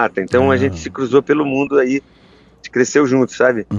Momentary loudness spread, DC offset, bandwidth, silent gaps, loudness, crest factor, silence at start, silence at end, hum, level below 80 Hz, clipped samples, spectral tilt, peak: 7 LU; under 0.1%; 8.2 kHz; none; -16 LUFS; 16 dB; 0 s; 0 s; none; -50 dBFS; under 0.1%; -6 dB/octave; 0 dBFS